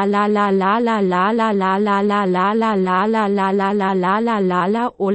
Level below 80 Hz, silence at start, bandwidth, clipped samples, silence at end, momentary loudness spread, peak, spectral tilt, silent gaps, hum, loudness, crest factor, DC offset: -58 dBFS; 0 s; 8.4 kHz; under 0.1%; 0 s; 1 LU; -6 dBFS; -7.5 dB/octave; none; none; -17 LUFS; 10 dB; under 0.1%